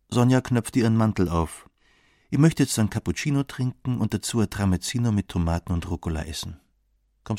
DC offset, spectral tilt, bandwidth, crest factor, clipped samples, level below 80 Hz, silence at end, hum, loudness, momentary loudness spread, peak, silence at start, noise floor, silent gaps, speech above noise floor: under 0.1%; -6 dB/octave; 16 kHz; 20 dB; under 0.1%; -42 dBFS; 0 s; none; -24 LUFS; 9 LU; -4 dBFS; 0.1 s; -67 dBFS; none; 44 dB